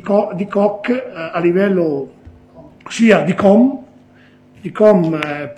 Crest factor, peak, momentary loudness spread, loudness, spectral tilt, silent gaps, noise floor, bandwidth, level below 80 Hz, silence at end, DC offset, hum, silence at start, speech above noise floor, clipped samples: 16 dB; 0 dBFS; 16 LU; -15 LUFS; -7 dB/octave; none; -46 dBFS; 9.2 kHz; -54 dBFS; 0.05 s; under 0.1%; 50 Hz at -35 dBFS; 0.05 s; 32 dB; under 0.1%